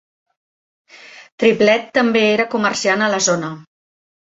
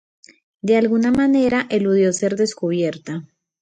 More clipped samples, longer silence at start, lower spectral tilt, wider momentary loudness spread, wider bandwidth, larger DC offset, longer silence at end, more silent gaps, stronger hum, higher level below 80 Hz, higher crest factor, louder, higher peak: neither; first, 1.05 s vs 0.65 s; second, -3.5 dB/octave vs -5.5 dB/octave; second, 6 LU vs 13 LU; second, 8 kHz vs 9.6 kHz; neither; first, 0.6 s vs 0.4 s; first, 1.32-1.38 s vs none; neither; second, -62 dBFS vs -56 dBFS; about the same, 16 dB vs 14 dB; about the same, -16 LUFS vs -18 LUFS; first, -2 dBFS vs -6 dBFS